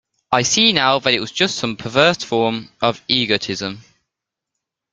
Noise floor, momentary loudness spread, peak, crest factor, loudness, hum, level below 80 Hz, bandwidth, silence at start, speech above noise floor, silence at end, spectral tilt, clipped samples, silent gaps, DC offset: -83 dBFS; 9 LU; 0 dBFS; 20 dB; -17 LUFS; none; -56 dBFS; 10 kHz; 0.3 s; 65 dB; 1.1 s; -3 dB/octave; under 0.1%; none; under 0.1%